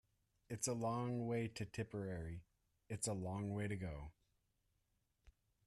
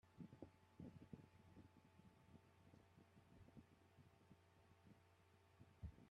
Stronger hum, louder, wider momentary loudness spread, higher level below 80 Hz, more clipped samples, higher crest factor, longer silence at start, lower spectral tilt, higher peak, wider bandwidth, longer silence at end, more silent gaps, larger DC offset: neither; first, -44 LUFS vs -65 LUFS; first, 11 LU vs 7 LU; first, -66 dBFS vs -76 dBFS; neither; second, 18 dB vs 24 dB; first, 0.5 s vs 0.05 s; second, -5.5 dB/octave vs -7.5 dB/octave; first, -28 dBFS vs -42 dBFS; first, 13.5 kHz vs 8.8 kHz; first, 0.35 s vs 0 s; neither; neither